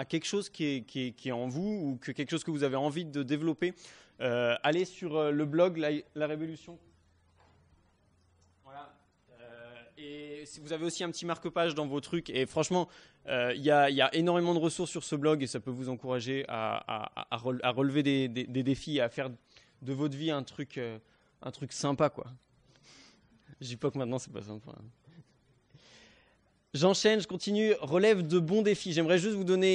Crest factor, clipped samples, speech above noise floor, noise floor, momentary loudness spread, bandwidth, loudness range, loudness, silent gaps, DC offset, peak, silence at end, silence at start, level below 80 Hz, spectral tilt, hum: 20 dB; under 0.1%; 37 dB; -69 dBFS; 18 LU; 10.5 kHz; 12 LU; -31 LUFS; none; under 0.1%; -12 dBFS; 0 s; 0 s; -70 dBFS; -5 dB/octave; none